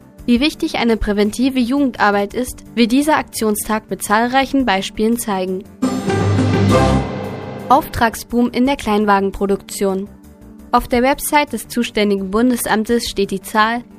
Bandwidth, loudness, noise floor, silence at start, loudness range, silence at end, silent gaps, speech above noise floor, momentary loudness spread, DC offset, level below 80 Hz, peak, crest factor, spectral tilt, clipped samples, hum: 15.5 kHz; -17 LUFS; -39 dBFS; 0.2 s; 1 LU; 0 s; none; 23 dB; 7 LU; under 0.1%; -36 dBFS; 0 dBFS; 16 dB; -5 dB/octave; under 0.1%; none